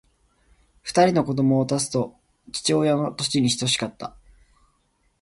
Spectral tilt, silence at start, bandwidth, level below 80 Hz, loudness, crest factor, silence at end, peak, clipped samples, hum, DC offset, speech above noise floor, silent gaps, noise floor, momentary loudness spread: -4.5 dB/octave; 0.85 s; 11.5 kHz; -58 dBFS; -22 LUFS; 20 dB; 1.15 s; -4 dBFS; under 0.1%; none; under 0.1%; 46 dB; none; -67 dBFS; 14 LU